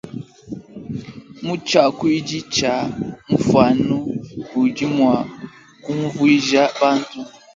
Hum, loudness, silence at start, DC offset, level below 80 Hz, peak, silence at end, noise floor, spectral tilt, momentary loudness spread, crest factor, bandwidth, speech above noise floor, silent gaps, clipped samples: none; -18 LUFS; 0.05 s; under 0.1%; -52 dBFS; 0 dBFS; 0.25 s; -38 dBFS; -5 dB/octave; 20 LU; 18 dB; 7.6 kHz; 21 dB; none; under 0.1%